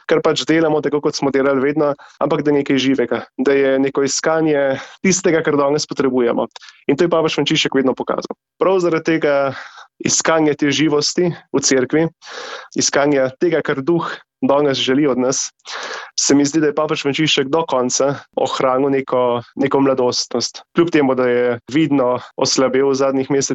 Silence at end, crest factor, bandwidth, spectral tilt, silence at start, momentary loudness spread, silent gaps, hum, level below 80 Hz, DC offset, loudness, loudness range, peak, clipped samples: 0 s; 14 dB; 8.4 kHz; -4 dB/octave; 0.1 s; 7 LU; none; none; -58 dBFS; under 0.1%; -17 LUFS; 1 LU; -2 dBFS; under 0.1%